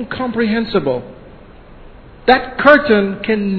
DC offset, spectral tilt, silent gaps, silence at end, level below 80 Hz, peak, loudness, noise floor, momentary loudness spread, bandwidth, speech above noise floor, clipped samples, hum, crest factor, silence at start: under 0.1%; -8 dB/octave; none; 0 s; -40 dBFS; 0 dBFS; -14 LUFS; -39 dBFS; 11 LU; 5.4 kHz; 25 dB; 0.2%; none; 16 dB; 0 s